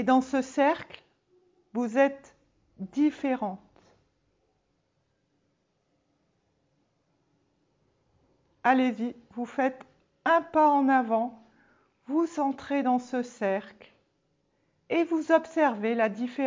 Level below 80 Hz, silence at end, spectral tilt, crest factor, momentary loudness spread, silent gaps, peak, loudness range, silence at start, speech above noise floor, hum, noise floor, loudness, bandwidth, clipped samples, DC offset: -72 dBFS; 0 s; -5.5 dB/octave; 22 dB; 12 LU; none; -8 dBFS; 8 LU; 0 s; 48 dB; none; -74 dBFS; -27 LUFS; 7.6 kHz; under 0.1%; under 0.1%